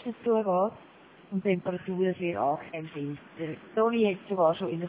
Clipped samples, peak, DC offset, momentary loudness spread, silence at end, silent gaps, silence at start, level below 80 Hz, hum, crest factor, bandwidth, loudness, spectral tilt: under 0.1%; -12 dBFS; under 0.1%; 12 LU; 0 s; none; 0 s; -70 dBFS; none; 18 dB; 4 kHz; -29 LUFS; -10.5 dB/octave